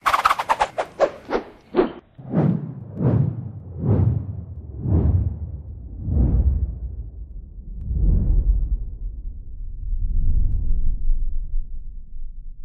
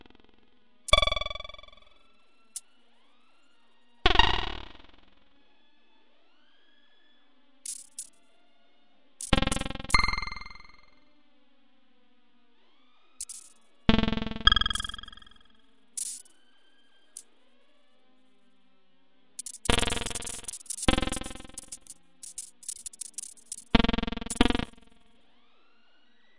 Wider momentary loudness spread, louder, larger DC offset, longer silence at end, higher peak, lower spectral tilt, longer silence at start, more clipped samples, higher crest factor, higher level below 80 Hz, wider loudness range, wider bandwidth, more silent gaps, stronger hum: about the same, 19 LU vs 21 LU; first, -24 LUFS vs -29 LUFS; neither; about the same, 0 s vs 0 s; about the same, -2 dBFS vs -2 dBFS; first, -7.5 dB/octave vs -3 dB/octave; about the same, 0.05 s vs 0 s; neither; second, 20 dB vs 30 dB; first, -24 dBFS vs -40 dBFS; second, 6 LU vs 17 LU; about the same, 12 kHz vs 11.5 kHz; neither; neither